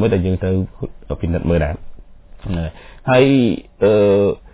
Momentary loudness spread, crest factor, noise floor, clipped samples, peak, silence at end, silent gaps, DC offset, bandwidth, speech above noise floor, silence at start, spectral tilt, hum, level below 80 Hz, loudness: 15 LU; 16 dB; -37 dBFS; under 0.1%; 0 dBFS; 0.05 s; none; under 0.1%; 4 kHz; 21 dB; 0 s; -11.5 dB/octave; none; -30 dBFS; -17 LUFS